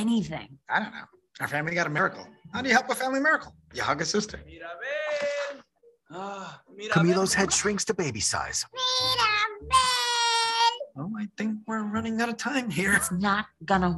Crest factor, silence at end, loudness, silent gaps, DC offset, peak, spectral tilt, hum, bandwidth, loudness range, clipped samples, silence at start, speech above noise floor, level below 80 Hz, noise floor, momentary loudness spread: 20 dB; 0 s; -26 LUFS; none; under 0.1%; -6 dBFS; -3 dB/octave; none; 13.5 kHz; 5 LU; under 0.1%; 0 s; 32 dB; -54 dBFS; -60 dBFS; 15 LU